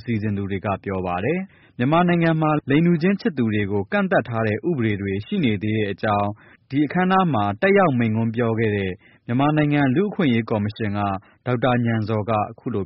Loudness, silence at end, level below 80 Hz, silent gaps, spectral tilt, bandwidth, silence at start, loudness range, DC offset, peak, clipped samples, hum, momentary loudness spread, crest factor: -21 LUFS; 0 s; -54 dBFS; none; -6.5 dB/octave; 5.8 kHz; 0.05 s; 2 LU; under 0.1%; -6 dBFS; under 0.1%; none; 8 LU; 14 dB